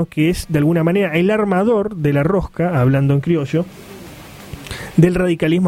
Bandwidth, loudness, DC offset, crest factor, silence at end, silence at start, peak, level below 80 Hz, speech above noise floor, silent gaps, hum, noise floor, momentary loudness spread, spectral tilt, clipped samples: 16 kHz; -16 LUFS; under 0.1%; 16 dB; 0 s; 0 s; 0 dBFS; -38 dBFS; 21 dB; none; none; -36 dBFS; 20 LU; -7.5 dB/octave; under 0.1%